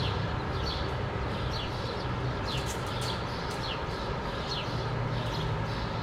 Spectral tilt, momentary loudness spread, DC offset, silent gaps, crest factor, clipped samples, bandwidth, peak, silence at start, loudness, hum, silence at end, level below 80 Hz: -5.5 dB/octave; 2 LU; under 0.1%; none; 14 dB; under 0.1%; 15.5 kHz; -18 dBFS; 0 s; -33 LUFS; none; 0 s; -42 dBFS